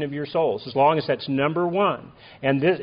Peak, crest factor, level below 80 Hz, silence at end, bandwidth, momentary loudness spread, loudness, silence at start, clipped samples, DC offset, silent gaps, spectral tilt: -6 dBFS; 16 dB; -62 dBFS; 0 s; 5.2 kHz; 6 LU; -23 LUFS; 0 s; under 0.1%; under 0.1%; none; -4.5 dB/octave